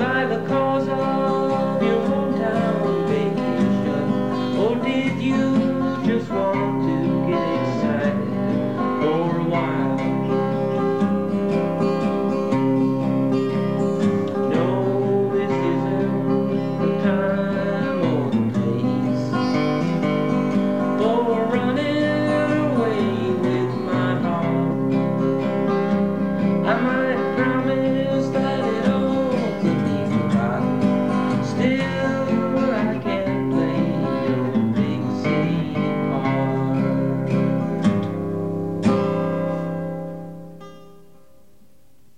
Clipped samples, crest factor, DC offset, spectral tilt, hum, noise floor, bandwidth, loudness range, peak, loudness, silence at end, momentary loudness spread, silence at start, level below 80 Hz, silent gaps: under 0.1%; 14 dB; 0.6%; -8 dB/octave; none; -58 dBFS; 9.8 kHz; 1 LU; -6 dBFS; -21 LUFS; 1.3 s; 3 LU; 0 s; -54 dBFS; none